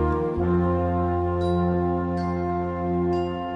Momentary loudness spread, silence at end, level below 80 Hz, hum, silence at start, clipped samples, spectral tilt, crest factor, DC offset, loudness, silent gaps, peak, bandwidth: 4 LU; 0 s; -38 dBFS; none; 0 s; under 0.1%; -9.5 dB/octave; 12 dB; under 0.1%; -24 LUFS; none; -12 dBFS; 5.8 kHz